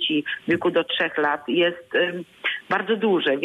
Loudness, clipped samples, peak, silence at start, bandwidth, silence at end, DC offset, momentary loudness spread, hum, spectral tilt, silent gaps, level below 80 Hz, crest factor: -23 LUFS; under 0.1%; -10 dBFS; 0 s; 11.5 kHz; 0 s; under 0.1%; 5 LU; none; -6 dB/octave; none; -66 dBFS; 14 dB